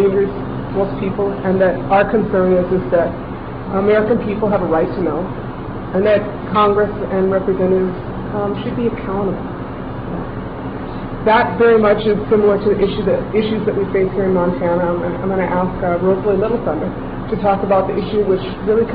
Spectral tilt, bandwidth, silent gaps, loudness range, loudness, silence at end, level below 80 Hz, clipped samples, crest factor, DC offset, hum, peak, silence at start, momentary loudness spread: -10.5 dB/octave; 5 kHz; none; 4 LU; -17 LUFS; 0 s; -34 dBFS; under 0.1%; 14 dB; 0.2%; none; -2 dBFS; 0 s; 11 LU